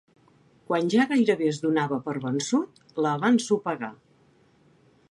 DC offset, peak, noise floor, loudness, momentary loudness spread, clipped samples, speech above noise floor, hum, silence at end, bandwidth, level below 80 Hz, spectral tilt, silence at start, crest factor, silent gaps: under 0.1%; -10 dBFS; -61 dBFS; -25 LUFS; 9 LU; under 0.1%; 36 dB; none; 1.15 s; 11.5 kHz; -74 dBFS; -5.5 dB/octave; 0.7 s; 18 dB; none